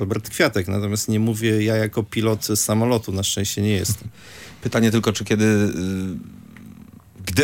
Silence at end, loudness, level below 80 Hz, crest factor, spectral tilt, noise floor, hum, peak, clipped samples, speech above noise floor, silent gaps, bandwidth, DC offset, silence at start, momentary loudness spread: 0 s; -21 LUFS; -54 dBFS; 18 dB; -5 dB/octave; -44 dBFS; none; -2 dBFS; under 0.1%; 23 dB; none; 17 kHz; under 0.1%; 0 s; 12 LU